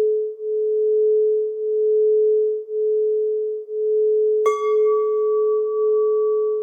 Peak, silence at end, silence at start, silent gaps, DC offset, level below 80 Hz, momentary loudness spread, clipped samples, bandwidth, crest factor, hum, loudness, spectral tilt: -8 dBFS; 0 s; 0 s; none; under 0.1%; under -90 dBFS; 6 LU; under 0.1%; 6.6 kHz; 12 dB; none; -20 LUFS; -3 dB/octave